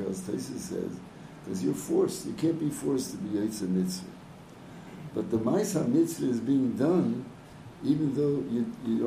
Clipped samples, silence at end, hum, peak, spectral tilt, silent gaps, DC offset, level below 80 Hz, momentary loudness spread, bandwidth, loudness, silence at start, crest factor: under 0.1%; 0 s; none; -14 dBFS; -6.5 dB/octave; none; under 0.1%; -62 dBFS; 19 LU; 15.5 kHz; -29 LUFS; 0 s; 16 dB